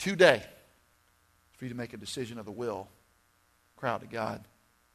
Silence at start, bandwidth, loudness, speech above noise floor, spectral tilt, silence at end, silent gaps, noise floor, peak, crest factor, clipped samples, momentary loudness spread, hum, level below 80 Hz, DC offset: 0 s; 13.5 kHz; -31 LUFS; 38 dB; -4.5 dB/octave; 0.5 s; none; -68 dBFS; -6 dBFS; 28 dB; under 0.1%; 22 LU; none; -68 dBFS; under 0.1%